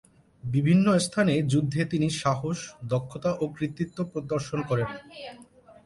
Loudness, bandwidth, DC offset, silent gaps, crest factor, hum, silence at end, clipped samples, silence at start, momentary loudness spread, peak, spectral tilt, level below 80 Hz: -27 LUFS; 11.5 kHz; under 0.1%; none; 16 dB; none; 0.15 s; under 0.1%; 0.45 s; 12 LU; -10 dBFS; -6 dB/octave; -58 dBFS